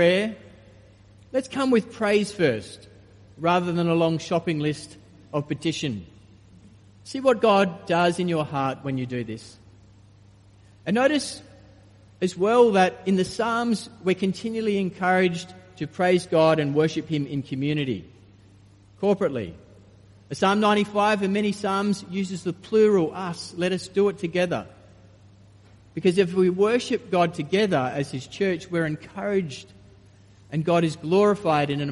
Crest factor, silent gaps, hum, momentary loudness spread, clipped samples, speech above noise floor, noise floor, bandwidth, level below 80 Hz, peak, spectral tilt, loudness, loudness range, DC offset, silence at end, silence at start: 18 dB; none; none; 12 LU; under 0.1%; 29 dB; -52 dBFS; 11.5 kHz; -60 dBFS; -6 dBFS; -6 dB/octave; -24 LUFS; 5 LU; under 0.1%; 0 s; 0 s